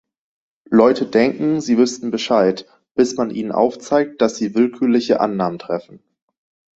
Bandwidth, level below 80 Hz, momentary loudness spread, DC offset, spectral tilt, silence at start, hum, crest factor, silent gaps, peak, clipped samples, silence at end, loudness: 8 kHz; -60 dBFS; 9 LU; under 0.1%; -5.5 dB/octave; 0.7 s; none; 18 dB; 2.91-2.95 s; 0 dBFS; under 0.1%; 0.8 s; -18 LUFS